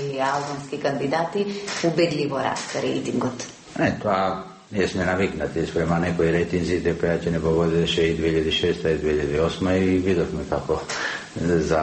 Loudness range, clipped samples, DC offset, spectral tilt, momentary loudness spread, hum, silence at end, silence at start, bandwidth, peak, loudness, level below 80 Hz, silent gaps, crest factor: 3 LU; under 0.1%; under 0.1%; -5.5 dB/octave; 6 LU; none; 0 s; 0 s; 8.8 kHz; -8 dBFS; -23 LUFS; -42 dBFS; none; 16 dB